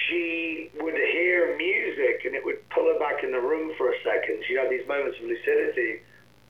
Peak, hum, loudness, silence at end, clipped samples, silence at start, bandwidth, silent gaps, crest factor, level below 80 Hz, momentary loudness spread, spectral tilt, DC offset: -12 dBFS; none; -26 LUFS; 0.5 s; under 0.1%; 0 s; 6.2 kHz; none; 16 dB; -68 dBFS; 7 LU; -5 dB/octave; 0.1%